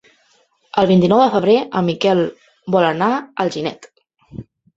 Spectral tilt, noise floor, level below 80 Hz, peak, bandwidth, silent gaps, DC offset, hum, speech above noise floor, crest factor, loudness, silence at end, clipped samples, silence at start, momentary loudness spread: -7 dB/octave; -58 dBFS; -56 dBFS; 0 dBFS; 7.8 kHz; none; under 0.1%; none; 43 dB; 18 dB; -16 LUFS; 0.35 s; under 0.1%; 0.75 s; 23 LU